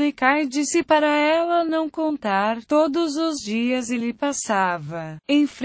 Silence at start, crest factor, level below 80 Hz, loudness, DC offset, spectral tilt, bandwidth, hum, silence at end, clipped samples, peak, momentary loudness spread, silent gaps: 0 s; 16 dB; -62 dBFS; -21 LUFS; under 0.1%; -4 dB/octave; 8 kHz; none; 0 s; under 0.1%; -4 dBFS; 6 LU; none